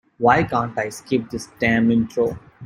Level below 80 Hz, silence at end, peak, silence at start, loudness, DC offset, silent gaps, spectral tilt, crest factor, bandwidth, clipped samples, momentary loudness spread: -48 dBFS; 0 s; -2 dBFS; 0.2 s; -20 LUFS; under 0.1%; none; -6 dB/octave; 18 dB; 15 kHz; under 0.1%; 8 LU